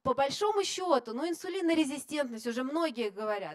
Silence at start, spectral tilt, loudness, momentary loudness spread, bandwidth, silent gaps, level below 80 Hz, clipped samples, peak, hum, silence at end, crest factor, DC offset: 0.05 s; -3.5 dB/octave; -31 LUFS; 6 LU; 14.5 kHz; none; -70 dBFS; under 0.1%; -12 dBFS; none; 0 s; 18 dB; under 0.1%